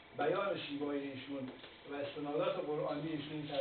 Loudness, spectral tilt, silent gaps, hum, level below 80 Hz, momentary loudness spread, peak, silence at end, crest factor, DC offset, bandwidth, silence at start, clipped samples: -40 LUFS; -4 dB/octave; none; none; -76 dBFS; 9 LU; -24 dBFS; 0 s; 16 dB; under 0.1%; 4.6 kHz; 0 s; under 0.1%